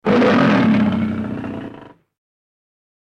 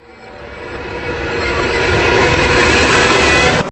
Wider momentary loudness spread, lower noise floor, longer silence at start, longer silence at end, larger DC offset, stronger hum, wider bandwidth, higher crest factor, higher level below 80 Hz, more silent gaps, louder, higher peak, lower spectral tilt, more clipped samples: about the same, 17 LU vs 17 LU; first, -40 dBFS vs -33 dBFS; second, 0.05 s vs 0.2 s; first, 1.15 s vs 0 s; neither; neither; second, 7.6 kHz vs 10.5 kHz; about the same, 16 dB vs 14 dB; second, -52 dBFS vs -28 dBFS; neither; second, -16 LUFS vs -11 LUFS; about the same, -2 dBFS vs 0 dBFS; first, -7.5 dB/octave vs -4 dB/octave; neither